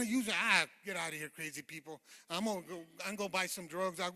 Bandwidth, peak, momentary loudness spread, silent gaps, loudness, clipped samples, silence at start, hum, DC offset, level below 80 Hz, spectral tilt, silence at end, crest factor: 15 kHz; -12 dBFS; 19 LU; none; -36 LUFS; under 0.1%; 0 s; none; under 0.1%; -80 dBFS; -2.5 dB/octave; 0 s; 26 dB